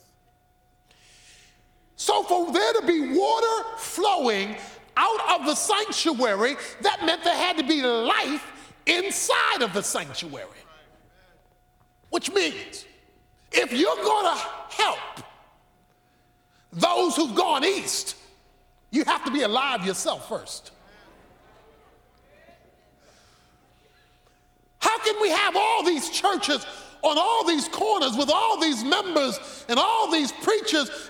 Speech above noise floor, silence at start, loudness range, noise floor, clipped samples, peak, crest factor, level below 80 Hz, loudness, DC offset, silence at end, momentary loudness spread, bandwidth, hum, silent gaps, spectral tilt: 39 dB; 2 s; 7 LU; -63 dBFS; under 0.1%; -6 dBFS; 20 dB; -64 dBFS; -23 LUFS; under 0.1%; 0 s; 11 LU; 18.5 kHz; none; none; -2 dB/octave